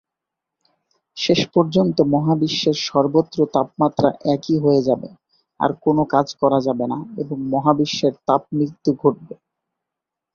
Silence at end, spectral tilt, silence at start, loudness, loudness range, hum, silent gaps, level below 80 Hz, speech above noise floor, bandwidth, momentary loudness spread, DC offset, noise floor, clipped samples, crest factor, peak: 1 s; -6.5 dB/octave; 1.15 s; -19 LUFS; 3 LU; none; none; -58 dBFS; 66 dB; 7 kHz; 7 LU; under 0.1%; -84 dBFS; under 0.1%; 18 dB; -2 dBFS